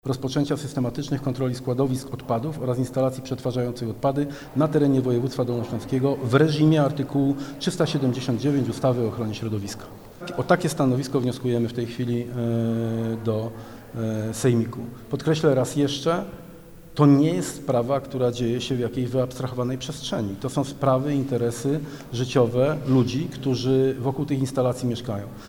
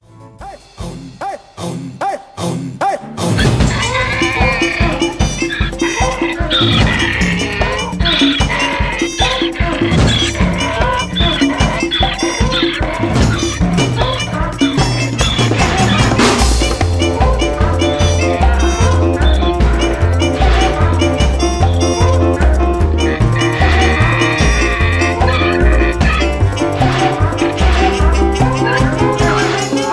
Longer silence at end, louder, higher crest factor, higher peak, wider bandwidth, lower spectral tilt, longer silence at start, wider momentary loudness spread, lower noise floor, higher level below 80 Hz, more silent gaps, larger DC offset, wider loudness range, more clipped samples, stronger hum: about the same, 0 s vs 0 s; second, -24 LUFS vs -13 LUFS; first, 18 dB vs 12 dB; second, -6 dBFS vs 0 dBFS; first, 17 kHz vs 11 kHz; first, -6.5 dB/octave vs -5 dB/octave; second, 0.05 s vs 0.2 s; first, 9 LU vs 6 LU; first, -43 dBFS vs -33 dBFS; second, -52 dBFS vs -18 dBFS; neither; neither; about the same, 4 LU vs 2 LU; neither; neither